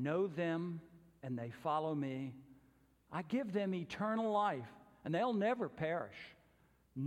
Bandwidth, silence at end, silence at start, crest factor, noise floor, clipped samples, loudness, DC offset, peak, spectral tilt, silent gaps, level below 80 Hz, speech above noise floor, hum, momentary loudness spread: 12.5 kHz; 0 s; 0 s; 16 dB; -71 dBFS; under 0.1%; -39 LUFS; under 0.1%; -24 dBFS; -7.5 dB/octave; none; -76 dBFS; 33 dB; none; 16 LU